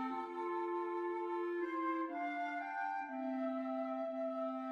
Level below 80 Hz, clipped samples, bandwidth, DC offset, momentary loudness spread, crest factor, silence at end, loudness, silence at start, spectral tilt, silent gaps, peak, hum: -90 dBFS; under 0.1%; 6.6 kHz; under 0.1%; 2 LU; 12 dB; 0 s; -40 LUFS; 0 s; -5.5 dB/octave; none; -28 dBFS; none